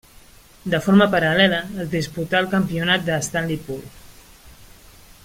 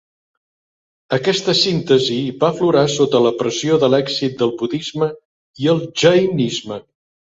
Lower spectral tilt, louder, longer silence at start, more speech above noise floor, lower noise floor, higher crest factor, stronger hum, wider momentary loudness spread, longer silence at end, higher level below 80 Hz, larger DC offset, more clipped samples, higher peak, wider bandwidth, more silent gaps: about the same, -5 dB/octave vs -5 dB/octave; about the same, -19 LUFS vs -17 LUFS; second, 0.65 s vs 1.1 s; second, 28 dB vs over 74 dB; second, -48 dBFS vs under -90 dBFS; about the same, 20 dB vs 16 dB; neither; first, 12 LU vs 8 LU; about the same, 0.6 s vs 0.55 s; first, -48 dBFS vs -58 dBFS; neither; neither; about the same, -2 dBFS vs -2 dBFS; first, 16.5 kHz vs 8 kHz; second, none vs 5.25-5.54 s